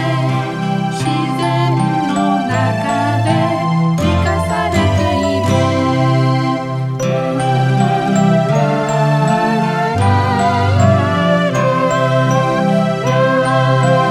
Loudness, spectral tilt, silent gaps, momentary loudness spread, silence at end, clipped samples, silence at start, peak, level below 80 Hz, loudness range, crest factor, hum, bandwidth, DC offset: -14 LUFS; -6.5 dB/octave; none; 4 LU; 0 s; under 0.1%; 0 s; 0 dBFS; -40 dBFS; 2 LU; 14 dB; none; 12.5 kHz; under 0.1%